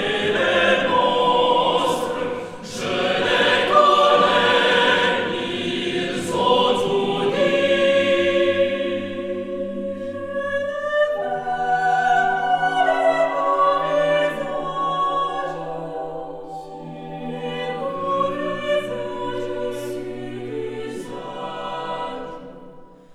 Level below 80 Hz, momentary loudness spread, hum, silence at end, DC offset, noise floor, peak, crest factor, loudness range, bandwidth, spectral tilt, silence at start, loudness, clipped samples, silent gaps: -52 dBFS; 15 LU; none; 0 s; under 0.1%; -42 dBFS; -2 dBFS; 18 dB; 10 LU; 13.5 kHz; -4 dB/octave; 0 s; -20 LUFS; under 0.1%; none